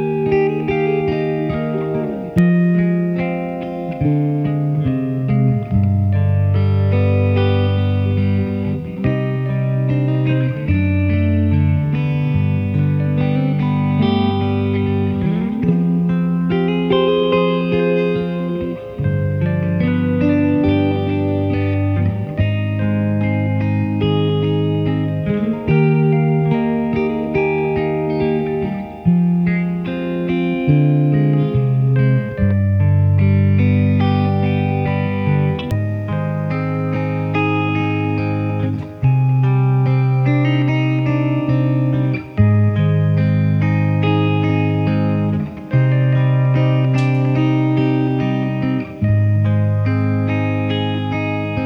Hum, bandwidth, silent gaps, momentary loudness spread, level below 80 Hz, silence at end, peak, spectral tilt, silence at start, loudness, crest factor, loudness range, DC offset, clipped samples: none; 5.4 kHz; none; 5 LU; -42 dBFS; 0 s; -2 dBFS; -10 dB/octave; 0 s; -17 LUFS; 14 dB; 2 LU; under 0.1%; under 0.1%